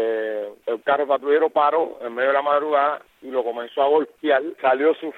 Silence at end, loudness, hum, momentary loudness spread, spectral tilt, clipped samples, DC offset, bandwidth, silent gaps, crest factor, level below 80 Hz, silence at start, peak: 0 s; -21 LUFS; none; 9 LU; -5.5 dB/octave; under 0.1%; under 0.1%; 4.2 kHz; none; 16 dB; -76 dBFS; 0 s; -6 dBFS